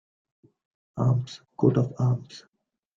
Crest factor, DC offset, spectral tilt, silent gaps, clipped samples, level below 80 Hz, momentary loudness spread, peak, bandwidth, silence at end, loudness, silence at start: 20 dB; under 0.1%; -9 dB/octave; none; under 0.1%; -60 dBFS; 20 LU; -8 dBFS; 7.4 kHz; 0.55 s; -26 LUFS; 0.95 s